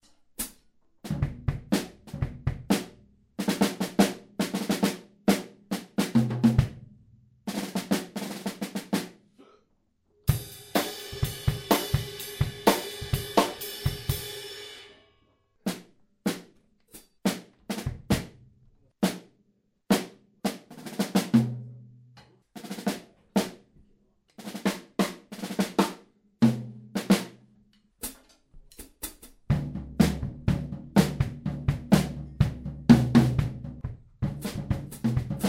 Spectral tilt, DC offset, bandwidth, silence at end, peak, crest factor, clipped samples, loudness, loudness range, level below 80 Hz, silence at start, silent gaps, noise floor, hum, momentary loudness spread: -5.5 dB/octave; under 0.1%; 16 kHz; 0 s; -4 dBFS; 26 dB; under 0.1%; -29 LUFS; 9 LU; -44 dBFS; 0.4 s; none; -70 dBFS; none; 15 LU